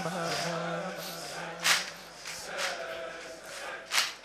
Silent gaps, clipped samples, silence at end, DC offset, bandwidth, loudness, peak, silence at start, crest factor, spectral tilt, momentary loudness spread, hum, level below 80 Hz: none; under 0.1%; 0 s; under 0.1%; 15 kHz; -33 LUFS; -8 dBFS; 0 s; 26 dB; -1.5 dB/octave; 14 LU; none; -68 dBFS